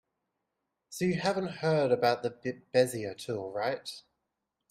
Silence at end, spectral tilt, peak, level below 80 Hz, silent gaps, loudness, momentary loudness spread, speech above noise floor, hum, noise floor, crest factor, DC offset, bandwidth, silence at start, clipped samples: 0.7 s; -5.5 dB/octave; -12 dBFS; -72 dBFS; none; -31 LUFS; 12 LU; 54 dB; none; -85 dBFS; 20 dB; under 0.1%; 15.5 kHz; 0.9 s; under 0.1%